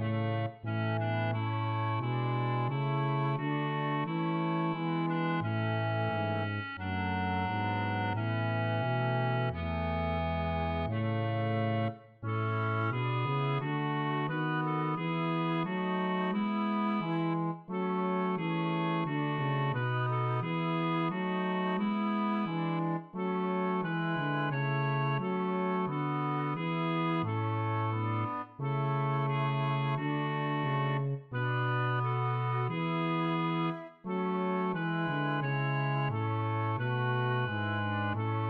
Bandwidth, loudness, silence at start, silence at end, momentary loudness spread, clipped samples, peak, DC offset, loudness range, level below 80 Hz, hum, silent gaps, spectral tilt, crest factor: 5 kHz; -32 LUFS; 0 s; 0 s; 2 LU; under 0.1%; -20 dBFS; under 0.1%; 1 LU; -56 dBFS; none; none; -9.5 dB/octave; 12 dB